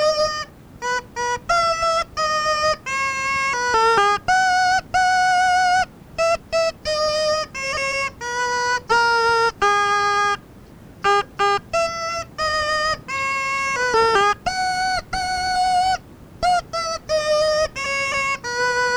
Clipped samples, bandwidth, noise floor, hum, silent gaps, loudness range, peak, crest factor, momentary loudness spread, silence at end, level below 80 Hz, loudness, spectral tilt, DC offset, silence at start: under 0.1%; over 20 kHz; -43 dBFS; none; none; 3 LU; -6 dBFS; 14 dB; 7 LU; 0 s; -46 dBFS; -20 LUFS; -1.5 dB/octave; under 0.1%; 0 s